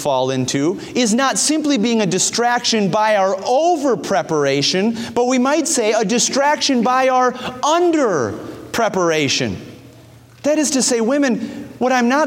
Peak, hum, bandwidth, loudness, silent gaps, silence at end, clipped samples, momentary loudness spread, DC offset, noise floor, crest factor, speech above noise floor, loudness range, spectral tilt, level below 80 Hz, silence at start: -4 dBFS; none; 16.5 kHz; -16 LUFS; none; 0 s; under 0.1%; 5 LU; under 0.1%; -43 dBFS; 14 dB; 27 dB; 3 LU; -3.5 dB/octave; -58 dBFS; 0 s